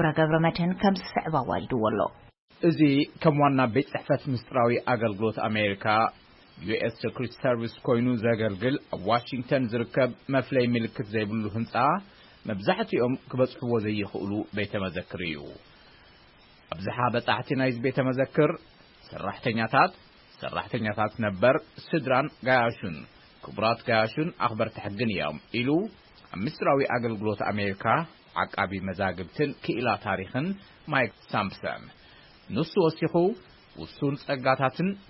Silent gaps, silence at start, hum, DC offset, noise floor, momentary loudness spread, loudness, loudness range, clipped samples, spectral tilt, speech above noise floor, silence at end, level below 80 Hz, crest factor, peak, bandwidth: 2.38-2.48 s; 0 s; none; under 0.1%; -56 dBFS; 10 LU; -27 LUFS; 4 LU; under 0.1%; -10.5 dB/octave; 29 dB; 0.1 s; -60 dBFS; 20 dB; -6 dBFS; 5.8 kHz